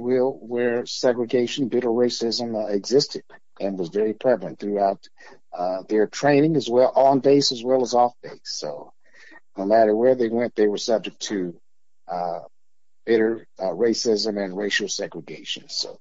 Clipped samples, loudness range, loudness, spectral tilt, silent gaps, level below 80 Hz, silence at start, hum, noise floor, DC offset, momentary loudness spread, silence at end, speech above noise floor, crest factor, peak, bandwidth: under 0.1%; 5 LU; -22 LUFS; -4.5 dB/octave; none; -74 dBFS; 0 s; none; -83 dBFS; 0.4%; 13 LU; 0.05 s; 61 dB; 16 dB; -6 dBFS; 7.8 kHz